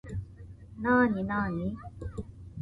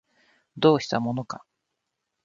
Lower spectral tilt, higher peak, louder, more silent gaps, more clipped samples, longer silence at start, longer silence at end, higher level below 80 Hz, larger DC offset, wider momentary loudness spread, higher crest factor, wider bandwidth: first, -9 dB/octave vs -6 dB/octave; second, -12 dBFS vs -6 dBFS; second, -30 LUFS vs -24 LUFS; neither; neither; second, 0.05 s vs 0.55 s; second, 0 s vs 0.85 s; first, -48 dBFS vs -66 dBFS; neither; first, 22 LU vs 17 LU; about the same, 18 dB vs 22 dB; about the same, 7.8 kHz vs 7.6 kHz